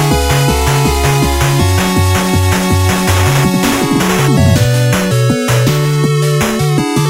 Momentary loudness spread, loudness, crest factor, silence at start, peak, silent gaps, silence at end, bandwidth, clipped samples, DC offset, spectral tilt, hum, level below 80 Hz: 2 LU; -11 LUFS; 10 dB; 0 s; 0 dBFS; none; 0 s; 16.5 kHz; under 0.1%; under 0.1%; -5 dB/octave; none; -24 dBFS